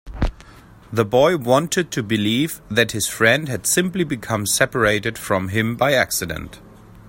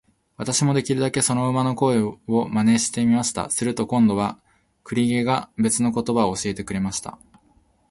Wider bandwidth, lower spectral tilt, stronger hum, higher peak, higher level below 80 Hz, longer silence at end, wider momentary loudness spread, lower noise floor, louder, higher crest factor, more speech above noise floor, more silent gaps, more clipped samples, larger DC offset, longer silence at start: first, 16.5 kHz vs 11.5 kHz; about the same, -4 dB/octave vs -5 dB/octave; neither; first, 0 dBFS vs -6 dBFS; first, -38 dBFS vs -54 dBFS; second, 0 s vs 0.8 s; first, 10 LU vs 7 LU; second, -45 dBFS vs -60 dBFS; first, -19 LUFS vs -22 LUFS; about the same, 20 dB vs 16 dB; second, 25 dB vs 39 dB; neither; neither; neither; second, 0.05 s vs 0.4 s